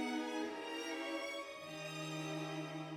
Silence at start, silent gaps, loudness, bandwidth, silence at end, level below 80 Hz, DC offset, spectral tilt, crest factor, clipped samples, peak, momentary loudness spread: 0 s; none; -43 LUFS; 17 kHz; 0 s; -84 dBFS; under 0.1%; -4.5 dB/octave; 14 dB; under 0.1%; -30 dBFS; 5 LU